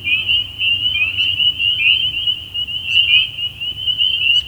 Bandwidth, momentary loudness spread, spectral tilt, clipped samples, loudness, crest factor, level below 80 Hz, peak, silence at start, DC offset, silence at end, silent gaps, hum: over 20 kHz; 8 LU; -1 dB/octave; under 0.1%; -14 LUFS; 16 dB; -44 dBFS; 0 dBFS; 0 s; under 0.1%; 0 s; none; none